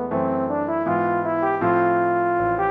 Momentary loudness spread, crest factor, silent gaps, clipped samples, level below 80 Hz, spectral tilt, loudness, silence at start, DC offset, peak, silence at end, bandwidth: 4 LU; 12 dB; none; under 0.1%; -54 dBFS; -10 dB/octave; -21 LUFS; 0 s; under 0.1%; -10 dBFS; 0 s; 3.8 kHz